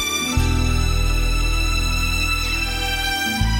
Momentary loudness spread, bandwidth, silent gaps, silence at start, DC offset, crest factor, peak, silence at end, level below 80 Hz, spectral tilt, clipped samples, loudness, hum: 2 LU; 16.5 kHz; none; 0 s; under 0.1%; 14 dB; -6 dBFS; 0 s; -22 dBFS; -3.5 dB/octave; under 0.1%; -20 LUFS; none